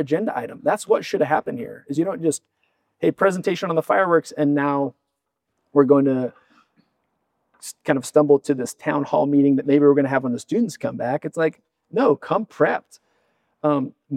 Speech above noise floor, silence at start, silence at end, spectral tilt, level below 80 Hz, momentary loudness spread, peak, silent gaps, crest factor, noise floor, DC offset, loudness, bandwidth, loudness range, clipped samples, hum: 58 dB; 0 s; 0 s; -6 dB/octave; -74 dBFS; 10 LU; -2 dBFS; none; 20 dB; -78 dBFS; under 0.1%; -21 LUFS; 14 kHz; 4 LU; under 0.1%; none